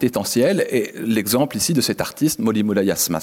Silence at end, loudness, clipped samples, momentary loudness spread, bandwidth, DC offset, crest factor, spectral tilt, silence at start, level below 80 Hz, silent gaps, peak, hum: 0 s; -19 LUFS; under 0.1%; 4 LU; 17 kHz; under 0.1%; 12 dB; -4 dB/octave; 0 s; -56 dBFS; none; -6 dBFS; none